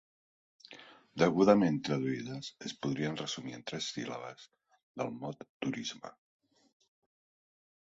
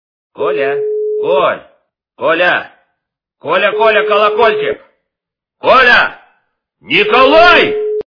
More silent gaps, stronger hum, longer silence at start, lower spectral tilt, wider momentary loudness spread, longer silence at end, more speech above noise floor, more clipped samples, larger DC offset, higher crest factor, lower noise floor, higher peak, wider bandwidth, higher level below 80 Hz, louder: first, 4.83-4.94 s, 5.49-5.60 s vs none; neither; first, 0.7 s vs 0.4 s; about the same, -5.5 dB/octave vs -4.5 dB/octave; first, 25 LU vs 13 LU; first, 1.75 s vs 0.1 s; second, 22 dB vs 71 dB; second, under 0.1% vs 0.4%; neither; first, 24 dB vs 12 dB; second, -55 dBFS vs -81 dBFS; second, -10 dBFS vs 0 dBFS; first, 8 kHz vs 5.4 kHz; second, -72 dBFS vs -44 dBFS; second, -34 LUFS vs -10 LUFS